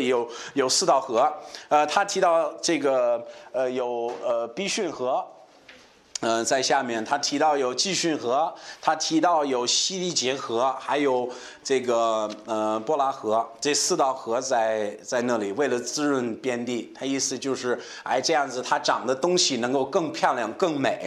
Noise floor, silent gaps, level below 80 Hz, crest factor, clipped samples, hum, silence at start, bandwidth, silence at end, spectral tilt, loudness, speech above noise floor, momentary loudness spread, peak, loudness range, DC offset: -52 dBFS; none; -76 dBFS; 18 dB; under 0.1%; none; 0 s; 13.5 kHz; 0 s; -2.5 dB/octave; -24 LUFS; 27 dB; 7 LU; -6 dBFS; 3 LU; under 0.1%